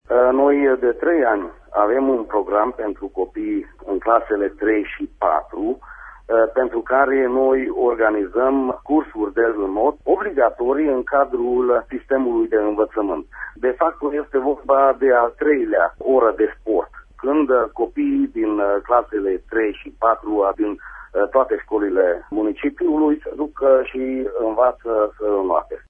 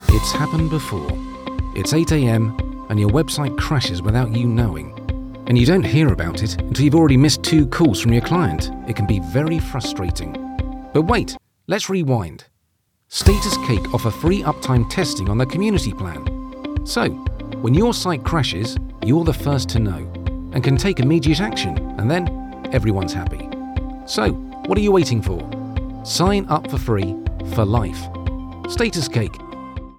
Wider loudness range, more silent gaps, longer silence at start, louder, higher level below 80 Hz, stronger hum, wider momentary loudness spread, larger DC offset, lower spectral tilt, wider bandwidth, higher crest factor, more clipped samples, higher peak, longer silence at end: about the same, 3 LU vs 5 LU; neither; about the same, 0.1 s vs 0 s; about the same, -19 LUFS vs -20 LUFS; second, -48 dBFS vs -28 dBFS; neither; second, 8 LU vs 12 LU; neither; first, -8.5 dB/octave vs -6 dB/octave; second, 3.6 kHz vs 18 kHz; about the same, 18 dB vs 18 dB; neither; about the same, 0 dBFS vs 0 dBFS; about the same, 0.1 s vs 0.05 s